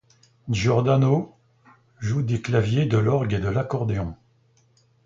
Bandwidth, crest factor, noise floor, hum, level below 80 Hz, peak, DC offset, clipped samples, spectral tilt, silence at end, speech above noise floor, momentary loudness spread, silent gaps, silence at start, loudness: 7.6 kHz; 16 dB; -61 dBFS; none; -46 dBFS; -6 dBFS; under 0.1%; under 0.1%; -7.5 dB/octave; 0.9 s; 40 dB; 12 LU; none; 0.45 s; -23 LUFS